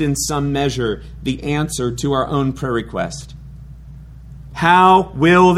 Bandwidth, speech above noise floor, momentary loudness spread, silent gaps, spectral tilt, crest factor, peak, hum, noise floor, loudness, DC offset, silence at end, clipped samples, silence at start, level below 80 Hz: 15 kHz; 21 dB; 19 LU; none; -5 dB/octave; 16 dB; 0 dBFS; none; -36 dBFS; -17 LUFS; under 0.1%; 0 s; under 0.1%; 0 s; -36 dBFS